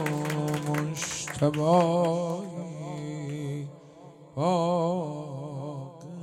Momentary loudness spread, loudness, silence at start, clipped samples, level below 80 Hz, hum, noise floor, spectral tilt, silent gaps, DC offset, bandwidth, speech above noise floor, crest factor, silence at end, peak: 15 LU; -29 LUFS; 0 s; under 0.1%; -66 dBFS; none; -49 dBFS; -6 dB/octave; none; under 0.1%; 16 kHz; 24 dB; 18 dB; 0 s; -10 dBFS